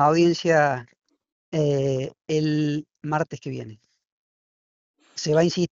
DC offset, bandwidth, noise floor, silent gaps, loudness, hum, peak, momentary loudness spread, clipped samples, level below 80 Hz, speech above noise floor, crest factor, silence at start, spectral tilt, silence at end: under 0.1%; 7.6 kHz; under -90 dBFS; 1.32-1.52 s, 4.12-4.94 s; -23 LUFS; none; -6 dBFS; 14 LU; under 0.1%; -62 dBFS; over 68 dB; 18 dB; 0 s; -5.5 dB/octave; 0.05 s